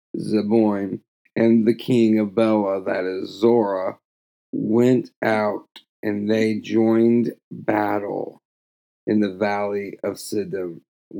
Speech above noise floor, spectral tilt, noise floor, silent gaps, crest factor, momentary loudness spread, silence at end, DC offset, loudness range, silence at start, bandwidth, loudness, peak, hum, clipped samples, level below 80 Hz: over 70 dB; -7 dB/octave; under -90 dBFS; 1.08-1.25 s, 4.05-4.53 s, 5.16-5.21 s, 5.89-6.03 s, 7.44-7.51 s, 8.45-9.07 s, 10.88-11.11 s; 16 dB; 13 LU; 0 s; under 0.1%; 5 LU; 0.15 s; 18.5 kHz; -21 LUFS; -4 dBFS; none; under 0.1%; -80 dBFS